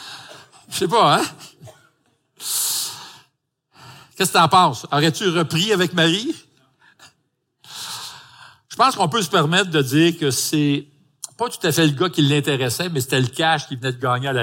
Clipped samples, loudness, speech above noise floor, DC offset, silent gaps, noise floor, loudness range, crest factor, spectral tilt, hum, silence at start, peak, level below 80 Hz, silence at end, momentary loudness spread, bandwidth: under 0.1%; -19 LUFS; 52 dB; under 0.1%; none; -70 dBFS; 5 LU; 20 dB; -4 dB/octave; none; 0 s; 0 dBFS; -64 dBFS; 0 s; 16 LU; 17 kHz